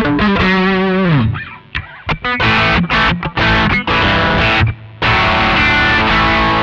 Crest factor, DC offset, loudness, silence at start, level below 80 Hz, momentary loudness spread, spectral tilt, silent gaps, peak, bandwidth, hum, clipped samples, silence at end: 12 dB; under 0.1%; -12 LUFS; 0 s; -26 dBFS; 9 LU; -6 dB/octave; none; -2 dBFS; 8 kHz; none; under 0.1%; 0 s